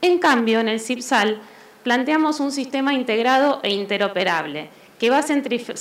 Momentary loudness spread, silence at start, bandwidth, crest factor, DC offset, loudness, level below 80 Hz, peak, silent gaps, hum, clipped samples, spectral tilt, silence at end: 9 LU; 0 s; 16 kHz; 16 dB; under 0.1%; -20 LUFS; -76 dBFS; -4 dBFS; none; none; under 0.1%; -3.5 dB/octave; 0 s